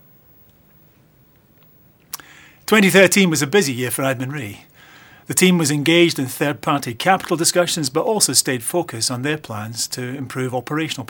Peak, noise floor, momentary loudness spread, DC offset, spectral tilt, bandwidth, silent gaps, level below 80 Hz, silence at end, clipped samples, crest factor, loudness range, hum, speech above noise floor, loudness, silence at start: 0 dBFS; -53 dBFS; 14 LU; under 0.1%; -3.5 dB/octave; over 20 kHz; none; -62 dBFS; 0.05 s; under 0.1%; 20 dB; 2 LU; none; 35 dB; -17 LUFS; 2.15 s